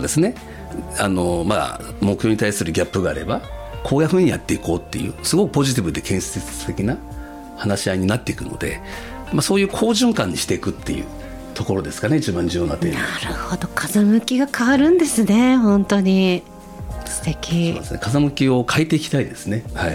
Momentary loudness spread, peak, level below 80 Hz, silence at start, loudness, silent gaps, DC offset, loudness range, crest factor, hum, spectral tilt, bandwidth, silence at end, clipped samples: 12 LU; -2 dBFS; -38 dBFS; 0 s; -19 LUFS; none; under 0.1%; 6 LU; 18 dB; none; -5 dB/octave; 18 kHz; 0 s; under 0.1%